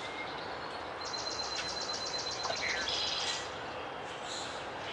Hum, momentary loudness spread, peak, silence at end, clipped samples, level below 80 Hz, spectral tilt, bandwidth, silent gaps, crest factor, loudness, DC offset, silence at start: none; 9 LU; -22 dBFS; 0 s; under 0.1%; -64 dBFS; -1.5 dB/octave; 12 kHz; none; 16 dB; -36 LUFS; under 0.1%; 0 s